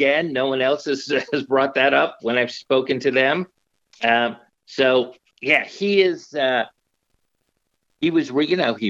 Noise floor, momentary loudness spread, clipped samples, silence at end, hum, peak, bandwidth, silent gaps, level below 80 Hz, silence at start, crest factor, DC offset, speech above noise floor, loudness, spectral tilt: -72 dBFS; 7 LU; under 0.1%; 0 s; none; -2 dBFS; 7.8 kHz; none; -72 dBFS; 0 s; 18 dB; under 0.1%; 52 dB; -20 LUFS; -5 dB/octave